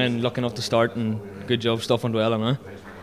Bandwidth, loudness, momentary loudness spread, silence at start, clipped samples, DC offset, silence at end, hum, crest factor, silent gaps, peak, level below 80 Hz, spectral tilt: 15 kHz; -24 LUFS; 7 LU; 0 s; under 0.1%; 0.1%; 0 s; none; 18 dB; none; -6 dBFS; -54 dBFS; -6 dB/octave